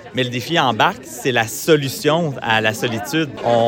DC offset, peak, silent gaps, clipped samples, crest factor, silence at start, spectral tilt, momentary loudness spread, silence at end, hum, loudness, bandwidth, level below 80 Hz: under 0.1%; 0 dBFS; none; under 0.1%; 18 dB; 0 s; -4.5 dB/octave; 5 LU; 0 s; none; -18 LUFS; 17 kHz; -56 dBFS